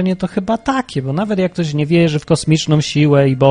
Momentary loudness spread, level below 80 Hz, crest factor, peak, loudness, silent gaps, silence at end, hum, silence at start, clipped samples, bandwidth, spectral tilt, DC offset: 7 LU; -44 dBFS; 14 dB; 0 dBFS; -15 LUFS; none; 0 s; none; 0 s; under 0.1%; 10 kHz; -6.5 dB/octave; under 0.1%